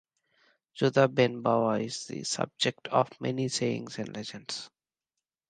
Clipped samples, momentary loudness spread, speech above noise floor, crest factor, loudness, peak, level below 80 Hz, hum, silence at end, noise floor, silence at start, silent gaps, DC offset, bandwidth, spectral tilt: under 0.1%; 13 LU; 60 dB; 22 dB; -29 LUFS; -8 dBFS; -72 dBFS; none; 0.8 s; -89 dBFS; 0.75 s; none; under 0.1%; 9.8 kHz; -4.5 dB/octave